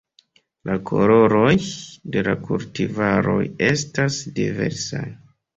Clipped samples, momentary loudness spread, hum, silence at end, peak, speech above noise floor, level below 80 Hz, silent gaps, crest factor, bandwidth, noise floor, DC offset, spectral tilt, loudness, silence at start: under 0.1%; 14 LU; none; 0.4 s; -2 dBFS; 39 dB; -50 dBFS; none; 18 dB; 8 kHz; -59 dBFS; under 0.1%; -5.5 dB/octave; -20 LUFS; 0.65 s